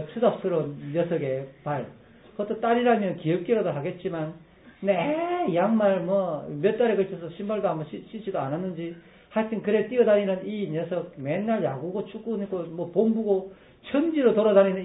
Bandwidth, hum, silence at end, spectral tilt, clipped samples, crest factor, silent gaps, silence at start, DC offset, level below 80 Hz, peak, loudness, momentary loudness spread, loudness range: 4 kHz; none; 0 s; -11.5 dB/octave; under 0.1%; 18 dB; none; 0 s; under 0.1%; -66 dBFS; -8 dBFS; -26 LUFS; 11 LU; 3 LU